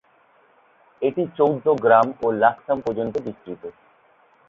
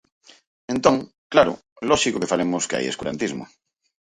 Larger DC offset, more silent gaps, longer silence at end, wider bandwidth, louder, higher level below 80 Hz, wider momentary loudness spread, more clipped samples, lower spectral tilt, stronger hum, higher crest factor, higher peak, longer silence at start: neither; second, none vs 1.18-1.30 s, 1.72-1.76 s; first, 0.8 s vs 0.6 s; second, 6.8 kHz vs 11.5 kHz; about the same, -21 LUFS vs -22 LUFS; second, -62 dBFS vs -54 dBFS; first, 19 LU vs 10 LU; neither; first, -8 dB/octave vs -3.5 dB/octave; neither; about the same, 20 dB vs 22 dB; about the same, -2 dBFS vs 0 dBFS; first, 1 s vs 0.7 s